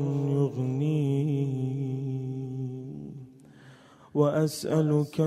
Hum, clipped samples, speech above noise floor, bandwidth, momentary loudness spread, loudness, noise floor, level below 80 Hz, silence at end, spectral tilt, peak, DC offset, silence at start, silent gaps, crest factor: none; under 0.1%; 28 dB; 14.5 kHz; 14 LU; -28 LUFS; -53 dBFS; -66 dBFS; 0 s; -8 dB/octave; -10 dBFS; under 0.1%; 0 s; none; 18 dB